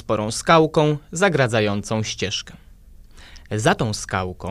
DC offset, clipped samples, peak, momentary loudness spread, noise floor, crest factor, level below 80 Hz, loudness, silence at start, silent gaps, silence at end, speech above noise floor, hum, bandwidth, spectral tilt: under 0.1%; under 0.1%; -2 dBFS; 10 LU; -45 dBFS; 20 dB; -44 dBFS; -20 LUFS; 0.05 s; none; 0 s; 25 dB; none; 14.5 kHz; -4.5 dB/octave